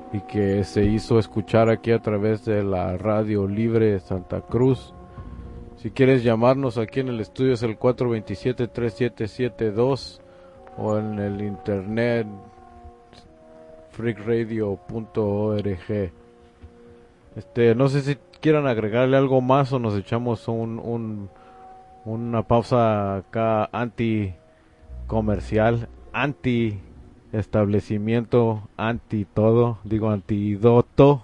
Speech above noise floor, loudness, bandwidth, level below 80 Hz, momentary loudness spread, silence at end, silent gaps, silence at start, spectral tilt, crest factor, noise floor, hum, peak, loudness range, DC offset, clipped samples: 31 dB; -23 LUFS; 10.5 kHz; -46 dBFS; 12 LU; 0 s; none; 0 s; -8.5 dB/octave; 20 dB; -52 dBFS; none; -2 dBFS; 6 LU; under 0.1%; under 0.1%